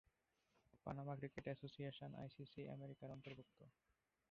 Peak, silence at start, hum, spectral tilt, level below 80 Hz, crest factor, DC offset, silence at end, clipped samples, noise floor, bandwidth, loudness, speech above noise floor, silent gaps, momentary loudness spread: -34 dBFS; 0.75 s; none; -6 dB/octave; -78 dBFS; 22 dB; under 0.1%; 0.6 s; under 0.1%; -85 dBFS; 6.6 kHz; -54 LUFS; 31 dB; none; 8 LU